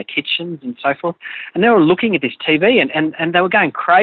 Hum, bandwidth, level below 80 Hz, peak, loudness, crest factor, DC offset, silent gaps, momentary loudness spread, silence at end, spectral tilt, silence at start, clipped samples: none; 4.6 kHz; -60 dBFS; 0 dBFS; -15 LUFS; 14 dB; under 0.1%; none; 11 LU; 0 s; -2.5 dB/octave; 0 s; under 0.1%